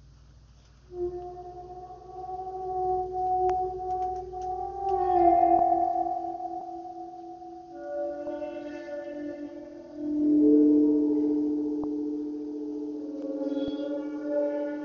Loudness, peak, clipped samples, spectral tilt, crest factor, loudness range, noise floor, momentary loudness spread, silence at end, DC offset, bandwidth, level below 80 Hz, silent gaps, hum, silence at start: -28 LUFS; -10 dBFS; under 0.1%; -6.5 dB/octave; 18 dB; 11 LU; -54 dBFS; 20 LU; 0 s; under 0.1%; 6.4 kHz; -56 dBFS; none; none; 0.05 s